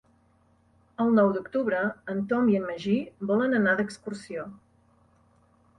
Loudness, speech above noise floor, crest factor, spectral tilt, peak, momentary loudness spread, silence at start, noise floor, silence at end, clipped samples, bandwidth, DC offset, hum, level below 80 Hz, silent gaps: -26 LUFS; 38 dB; 18 dB; -7 dB/octave; -10 dBFS; 15 LU; 1 s; -64 dBFS; 1.25 s; under 0.1%; 10.5 kHz; under 0.1%; none; -66 dBFS; none